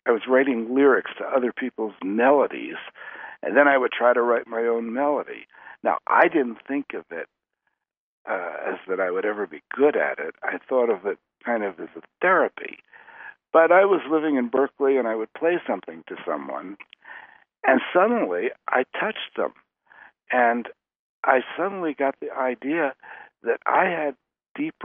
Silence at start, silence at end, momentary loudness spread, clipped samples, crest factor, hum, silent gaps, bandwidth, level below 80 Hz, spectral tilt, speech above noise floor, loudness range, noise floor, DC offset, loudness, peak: 0.05 s; 0 s; 19 LU; under 0.1%; 22 dB; none; 7.97-8.25 s, 20.96-21.23 s, 24.49-24.55 s; 3.7 kHz; -78 dBFS; -2.5 dB/octave; 54 dB; 5 LU; -77 dBFS; under 0.1%; -23 LUFS; -2 dBFS